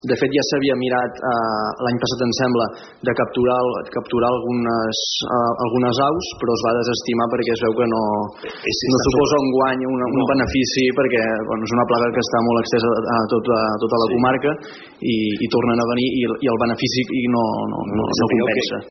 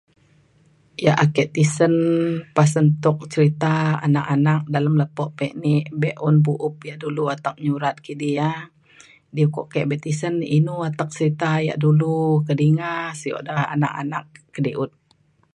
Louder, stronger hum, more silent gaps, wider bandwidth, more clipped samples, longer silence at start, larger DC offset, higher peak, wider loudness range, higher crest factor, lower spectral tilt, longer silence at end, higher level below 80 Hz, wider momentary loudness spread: about the same, -19 LUFS vs -21 LUFS; neither; neither; second, 6.4 kHz vs 11 kHz; neither; second, 0.05 s vs 1 s; neither; second, -6 dBFS vs -2 dBFS; second, 2 LU vs 5 LU; second, 14 dB vs 20 dB; second, -4 dB/octave vs -7 dB/octave; second, 0 s vs 0.65 s; first, -48 dBFS vs -62 dBFS; second, 5 LU vs 10 LU